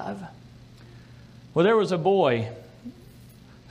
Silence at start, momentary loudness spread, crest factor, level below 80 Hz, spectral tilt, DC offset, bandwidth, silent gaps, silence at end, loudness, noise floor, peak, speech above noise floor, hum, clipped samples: 0 s; 23 LU; 18 dB; -60 dBFS; -7 dB/octave; under 0.1%; 11.5 kHz; none; 0.8 s; -23 LUFS; -49 dBFS; -8 dBFS; 26 dB; none; under 0.1%